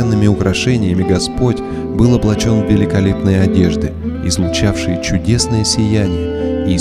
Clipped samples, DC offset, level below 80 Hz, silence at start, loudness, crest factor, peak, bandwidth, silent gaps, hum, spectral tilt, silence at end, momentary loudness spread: under 0.1%; under 0.1%; -28 dBFS; 0 s; -14 LUFS; 14 dB; 0 dBFS; 13.5 kHz; none; none; -5.5 dB/octave; 0 s; 5 LU